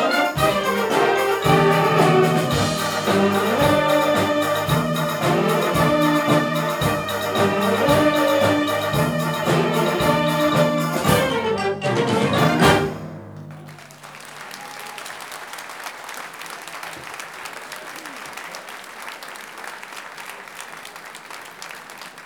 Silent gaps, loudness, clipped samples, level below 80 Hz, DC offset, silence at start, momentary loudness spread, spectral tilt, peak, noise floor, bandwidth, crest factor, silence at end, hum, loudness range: none; -19 LUFS; under 0.1%; -46 dBFS; under 0.1%; 0 s; 18 LU; -5 dB/octave; -2 dBFS; -40 dBFS; over 20 kHz; 18 dB; 0 s; none; 16 LU